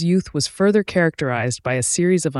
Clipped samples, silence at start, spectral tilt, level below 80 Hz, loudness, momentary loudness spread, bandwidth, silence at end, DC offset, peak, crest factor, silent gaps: under 0.1%; 0 s; -5 dB/octave; -52 dBFS; -19 LUFS; 5 LU; 12 kHz; 0 s; under 0.1%; -6 dBFS; 14 dB; none